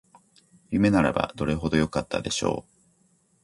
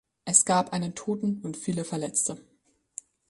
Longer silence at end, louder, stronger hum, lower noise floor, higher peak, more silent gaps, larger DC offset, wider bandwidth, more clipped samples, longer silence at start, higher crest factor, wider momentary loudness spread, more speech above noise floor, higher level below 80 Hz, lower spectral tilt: about the same, 0.8 s vs 0.9 s; about the same, -25 LUFS vs -26 LUFS; neither; first, -65 dBFS vs -48 dBFS; about the same, -6 dBFS vs -4 dBFS; neither; neither; about the same, 11.5 kHz vs 11.5 kHz; neither; first, 0.7 s vs 0.25 s; second, 20 dB vs 26 dB; second, 8 LU vs 23 LU; first, 41 dB vs 20 dB; first, -46 dBFS vs -66 dBFS; first, -5.5 dB/octave vs -3.5 dB/octave